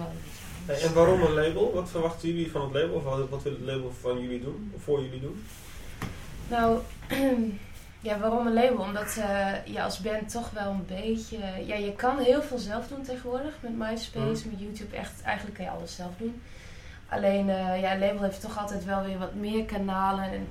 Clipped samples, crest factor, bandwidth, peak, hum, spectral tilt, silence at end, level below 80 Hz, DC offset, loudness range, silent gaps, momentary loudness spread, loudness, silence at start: under 0.1%; 20 dB; 16.5 kHz; -8 dBFS; none; -5.5 dB/octave; 0 s; -46 dBFS; under 0.1%; 7 LU; none; 14 LU; -29 LUFS; 0 s